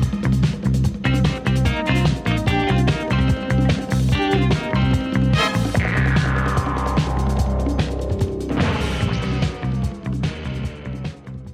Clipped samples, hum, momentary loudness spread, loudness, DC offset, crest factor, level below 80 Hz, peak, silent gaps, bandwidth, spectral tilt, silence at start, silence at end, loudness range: under 0.1%; none; 7 LU; -20 LUFS; under 0.1%; 14 dB; -28 dBFS; -4 dBFS; none; 13.5 kHz; -6.5 dB/octave; 0 s; 0 s; 4 LU